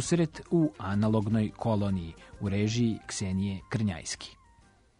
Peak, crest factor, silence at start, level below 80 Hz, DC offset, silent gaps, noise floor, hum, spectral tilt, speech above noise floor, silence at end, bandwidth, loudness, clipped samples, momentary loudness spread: -14 dBFS; 16 dB; 0 s; -54 dBFS; under 0.1%; none; -61 dBFS; none; -6 dB/octave; 32 dB; 0.65 s; 10.5 kHz; -30 LUFS; under 0.1%; 10 LU